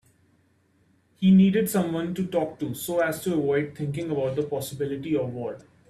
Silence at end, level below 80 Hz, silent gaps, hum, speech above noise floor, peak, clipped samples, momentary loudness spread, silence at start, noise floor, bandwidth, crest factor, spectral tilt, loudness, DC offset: 0.3 s; -62 dBFS; none; none; 40 dB; -10 dBFS; under 0.1%; 12 LU; 1.2 s; -64 dBFS; 14.5 kHz; 16 dB; -6.5 dB/octave; -25 LUFS; under 0.1%